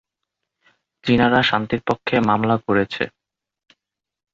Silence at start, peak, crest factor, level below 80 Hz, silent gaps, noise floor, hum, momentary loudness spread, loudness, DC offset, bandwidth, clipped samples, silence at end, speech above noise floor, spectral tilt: 1.05 s; -2 dBFS; 18 dB; -50 dBFS; none; -81 dBFS; none; 10 LU; -19 LUFS; under 0.1%; 7.4 kHz; under 0.1%; 1.25 s; 62 dB; -7 dB/octave